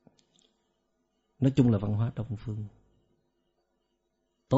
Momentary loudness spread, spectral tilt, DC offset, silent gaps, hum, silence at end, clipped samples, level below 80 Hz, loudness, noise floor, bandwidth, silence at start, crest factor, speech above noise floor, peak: 15 LU; -9.5 dB/octave; under 0.1%; none; 50 Hz at -55 dBFS; 0 s; under 0.1%; -56 dBFS; -29 LUFS; -78 dBFS; 7.6 kHz; 1.4 s; 22 dB; 50 dB; -10 dBFS